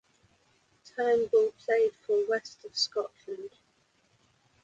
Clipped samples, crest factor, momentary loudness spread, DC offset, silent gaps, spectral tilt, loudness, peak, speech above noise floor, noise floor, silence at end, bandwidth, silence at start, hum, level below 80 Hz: under 0.1%; 16 dB; 16 LU; under 0.1%; none; -2 dB/octave; -29 LUFS; -14 dBFS; 41 dB; -69 dBFS; 1.15 s; 7.8 kHz; 0.95 s; none; -76 dBFS